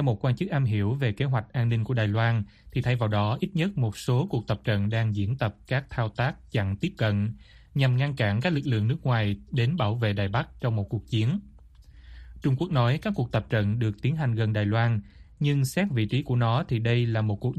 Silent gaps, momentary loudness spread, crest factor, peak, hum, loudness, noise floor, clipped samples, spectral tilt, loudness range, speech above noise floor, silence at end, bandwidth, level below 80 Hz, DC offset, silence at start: none; 5 LU; 16 dB; -10 dBFS; none; -27 LUFS; -50 dBFS; under 0.1%; -7.5 dB/octave; 2 LU; 25 dB; 0 s; 13 kHz; -50 dBFS; under 0.1%; 0 s